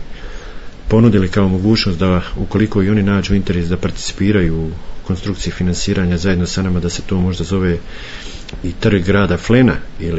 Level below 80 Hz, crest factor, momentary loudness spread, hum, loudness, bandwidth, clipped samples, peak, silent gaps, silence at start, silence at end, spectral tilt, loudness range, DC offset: -28 dBFS; 14 dB; 17 LU; none; -16 LUFS; 8 kHz; under 0.1%; 0 dBFS; none; 0 s; 0 s; -6.5 dB/octave; 3 LU; under 0.1%